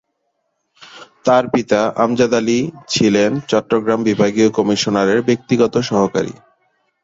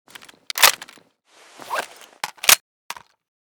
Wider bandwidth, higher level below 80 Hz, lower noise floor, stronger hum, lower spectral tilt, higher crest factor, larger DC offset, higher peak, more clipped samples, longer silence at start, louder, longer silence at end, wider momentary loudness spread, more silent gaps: second, 8 kHz vs over 20 kHz; first, -54 dBFS vs -64 dBFS; first, -70 dBFS vs -54 dBFS; neither; first, -5 dB/octave vs 2 dB/octave; second, 16 dB vs 24 dB; neither; about the same, 0 dBFS vs 0 dBFS; neither; first, 0.8 s vs 0.55 s; about the same, -16 LUFS vs -17 LUFS; first, 0.7 s vs 0.5 s; second, 4 LU vs 22 LU; second, none vs 2.60-2.90 s